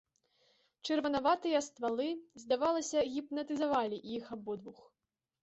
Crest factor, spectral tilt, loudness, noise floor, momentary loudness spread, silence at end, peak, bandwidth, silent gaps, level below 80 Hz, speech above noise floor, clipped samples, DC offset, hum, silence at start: 18 dB; -3.5 dB/octave; -35 LUFS; -73 dBFS; 12 LU; 0.7 s; -18 dBFS; 8.2 kHz; none; -72 dBFS; 39 dB; under 0.1%; under 0.1%; none; 0.85 s